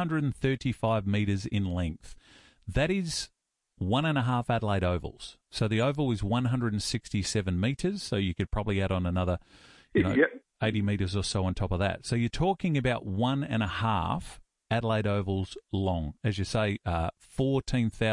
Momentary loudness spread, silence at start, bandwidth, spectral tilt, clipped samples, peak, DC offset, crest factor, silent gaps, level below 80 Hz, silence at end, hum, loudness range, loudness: 6 LU; 0 s; 11.5 kHz; -6 dB/octave; under 0.1%; -10 dBFS; under 0.1%; 18 dB; none; -46 dBFS; 0 s; none; 2 LU; -29 LUFS